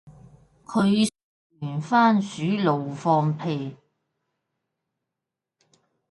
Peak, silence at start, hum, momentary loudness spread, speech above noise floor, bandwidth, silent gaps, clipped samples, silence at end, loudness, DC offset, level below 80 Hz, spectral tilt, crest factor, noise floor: -6 dBFS; 0.05 s; none; 12 LU; 64 dB; 11.5 kHz; 1.23-1.50 s; under 0.1%; 2.35 s; -23 LUFS; under 0.1%; -66 dBFS; -6.5 dB/octave; 18 dB; -86 dBFS